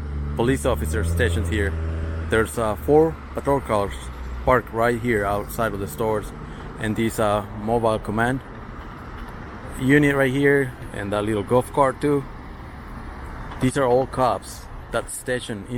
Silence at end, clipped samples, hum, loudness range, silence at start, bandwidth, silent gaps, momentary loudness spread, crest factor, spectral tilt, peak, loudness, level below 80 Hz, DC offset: 0 s; under 0.1%; none; 4 LU; 0 s; 17 kHz; none; 18 LU; 18 dB; -6 dB/octave; -4 dBFS; -22 LUFS; -36 dBFS; under 0.1%